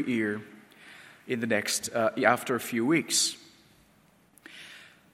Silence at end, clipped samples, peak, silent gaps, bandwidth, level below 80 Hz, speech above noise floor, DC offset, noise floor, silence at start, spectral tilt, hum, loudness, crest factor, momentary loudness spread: 0.25 s; under 0.1%; -6 dBFS; none; 16.5 kHz; -76 dBFS; 35 dB; under 0.1%; -62 dBFS; 0 s; -3 dB/octave; none; -27 LUFS; 24 dB; 24 LU